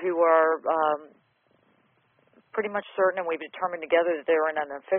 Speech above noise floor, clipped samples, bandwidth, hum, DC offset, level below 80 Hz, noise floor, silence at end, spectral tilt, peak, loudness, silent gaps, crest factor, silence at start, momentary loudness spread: 42 dB; under 0.1%; 3.7 kHz; none; under 0.1%; -74 dBFS; -67 dBFS; 0 s; -2 dB/octave; -8 dBFS; -25 LUFS; none; 18 dB; 0 s; 11 LU